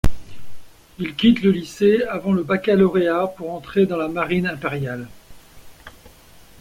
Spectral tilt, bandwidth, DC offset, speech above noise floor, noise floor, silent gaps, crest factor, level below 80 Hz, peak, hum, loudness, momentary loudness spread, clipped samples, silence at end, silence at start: -7 dB/octave; 16 kHz; under 0.1%; 28 dB; -47 dBFS; none; 16 dB; -38 dBFS; -4 dBFS; none; -20 LUFS; 13 LU; under 0.1%; 0.2 s; 0.05 s